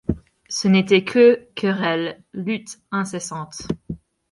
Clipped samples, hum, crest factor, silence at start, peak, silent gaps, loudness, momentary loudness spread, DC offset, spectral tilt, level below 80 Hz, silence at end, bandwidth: under 0.1%; none; 18 dB; 0.1 s; -2 dBFS; none; -20 LUFS; 16 LU; under 0.1%; -5 dB/octave; -46 dBFS; 0.35 s; 11.5 kHz